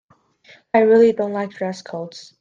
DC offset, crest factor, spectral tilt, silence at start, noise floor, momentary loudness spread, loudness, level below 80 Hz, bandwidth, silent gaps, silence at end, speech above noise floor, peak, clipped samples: under 0.1%; 18 dB; -6.5 dB/octave; 0.75 s; -52 dBFS; 18 LU; -17 LUFS; -66 dBFS; 7.6 kHz; none; 0.2 s; 34 dB; -2 dBFS; under 0.1%